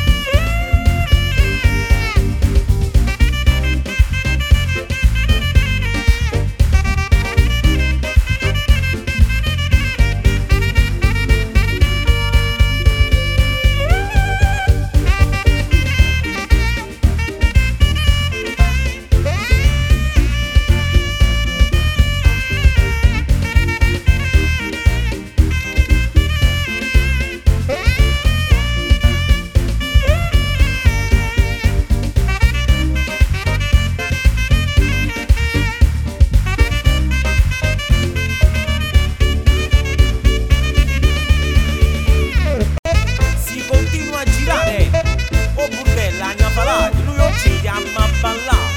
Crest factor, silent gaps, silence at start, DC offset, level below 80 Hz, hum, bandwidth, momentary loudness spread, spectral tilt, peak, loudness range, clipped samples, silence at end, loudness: 14 dB; 42.79-42.83 s; 0 s; under 0.1%; -16 dBFS; none; 16.5 kHz; 3 LU; -5 dB/octave; 0 dBFS; 1 LU; under 0.1%; 0 s; -16 LUFS